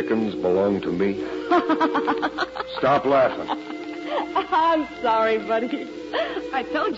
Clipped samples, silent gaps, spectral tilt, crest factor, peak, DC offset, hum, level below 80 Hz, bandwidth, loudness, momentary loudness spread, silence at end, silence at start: under 0.1%; none; -6 dB/octave; 14 dB; -8 dBFS; under 0.1%; none; -56 dBFS; 7.8 kHz; -23 LUFS; 9 LU; 0 s; 0 s